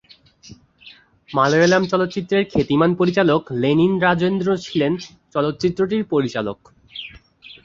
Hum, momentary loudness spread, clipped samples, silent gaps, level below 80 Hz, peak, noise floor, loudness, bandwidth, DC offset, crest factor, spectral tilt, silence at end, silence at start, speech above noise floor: none; 14 LU; under 0.1%; none; -52 dBFS; -2 dBFS; -47 dBFS; -19 LUFS; 7.6 kHz; under 0.1%; 18 dB; -6 dB/octave; 0.1 s; 0.45 s; 29 dB